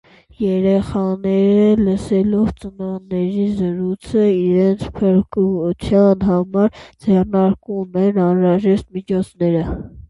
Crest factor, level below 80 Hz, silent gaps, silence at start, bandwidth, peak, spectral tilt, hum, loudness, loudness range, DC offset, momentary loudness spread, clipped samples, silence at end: 14 dB; -40 dBFS; none; 0.4 s; 11 kHz; -2 dBFS; -9 dB/octave; none; -17 LUFS; 2 LU; under 0.1%; 9 LU; under 0.1%; 0.05 s